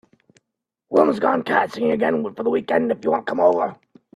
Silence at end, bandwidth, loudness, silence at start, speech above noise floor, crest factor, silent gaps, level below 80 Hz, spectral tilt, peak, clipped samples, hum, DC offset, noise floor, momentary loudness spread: 0.4 s; 12.5 kHz; -20 LUFS; 0.9 s; 61 dB; 18 dB; none; -66 dBFS; -7 dB/octave; -2 dBFS; under 0.1%; none; under 0.1%; -81 dBFS; 5 LU